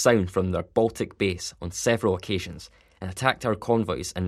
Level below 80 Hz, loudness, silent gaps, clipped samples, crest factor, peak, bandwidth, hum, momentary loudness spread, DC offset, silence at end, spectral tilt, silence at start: -50 dBFS; -26 LUFS; none; under 0.1%; 22 dB; -2 dBFS; 14.5 kHz; none; 10 LU; under 0.1%; 0 s; -5 dB/octave; 0 s